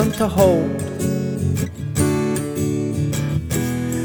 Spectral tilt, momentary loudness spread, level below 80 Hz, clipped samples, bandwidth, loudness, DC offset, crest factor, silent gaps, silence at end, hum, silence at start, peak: -6.5 dB/octave; 7 LU; -40 dBFS; under 0.1%; over 20 kHz; -20 LUFS; under 0.1%; 18 dB; none; 0 s; none; 0 s; -2 dBFS